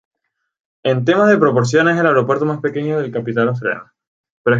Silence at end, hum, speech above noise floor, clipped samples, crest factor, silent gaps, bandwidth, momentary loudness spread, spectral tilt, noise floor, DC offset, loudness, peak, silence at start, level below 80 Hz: 0 s; none; 59 dB; under 0.1%; 14 dB; 4.07-4.24 s, 4.30-4.44 s; 7.8 kHz; 10 LU; -6.5 dB/octave; -74 dBFS; under 0.1%; -16 LUFS; -2 dBFS; 0.85 s; -60 dBFS